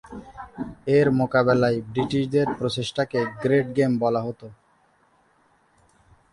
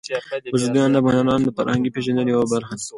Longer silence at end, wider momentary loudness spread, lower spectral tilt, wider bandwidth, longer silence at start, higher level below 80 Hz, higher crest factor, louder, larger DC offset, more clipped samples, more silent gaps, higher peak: first, 1.8 s vs 0 s; first, 16 LU vs 7 LU; about the same, -7 dB/octave vs -6 dB/octave; about the same, 11 kHz vs 11.5 kHz; about the same, 0.05 s vs 0.05 s; about the same, -54 dBFS vs -52 dBFS; about the same, 18 dB vs 16 dB; second, -23 LUFS vs -20 LUFS; neither; neither; neither; about the same, -6 dBFS vs -4 dBFS